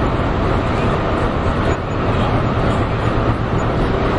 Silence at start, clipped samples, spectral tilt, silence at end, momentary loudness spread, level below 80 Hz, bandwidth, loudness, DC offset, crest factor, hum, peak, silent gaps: 0 s; under 0.1%; -7.5 dB/octave; 0 s; 1 LU; -24 dBFS; 10.5 kHz; -18 LUFS; under 0.1%; 14 dB; none; -2 dBFS; none